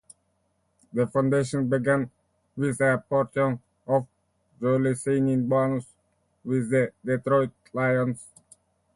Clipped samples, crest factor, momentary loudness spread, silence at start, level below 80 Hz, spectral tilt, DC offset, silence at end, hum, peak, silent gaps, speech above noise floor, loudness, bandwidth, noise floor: under 0.1%; 16 dB; 9 LU; 0.95 s; -62 dBFS; -7.5 dB/octave; under 0.1%; 0.7 s; none; -10 dBFS; none; 47 dB; -25 LUFS; 11.5 kHz; -72 dBFS